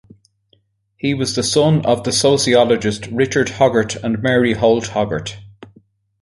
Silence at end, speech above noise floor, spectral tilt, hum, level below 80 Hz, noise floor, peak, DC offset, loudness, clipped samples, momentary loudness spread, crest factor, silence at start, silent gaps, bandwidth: 0.55 s; 45 dB; -4.5 dB/octave; none; -46 dBFS; -60 dBFS; -2 dBFS; under 0.1%; -16 LUFS; under 0.1%; 9 LU; 16 dB; 1.05 s; none; 11.5 kHz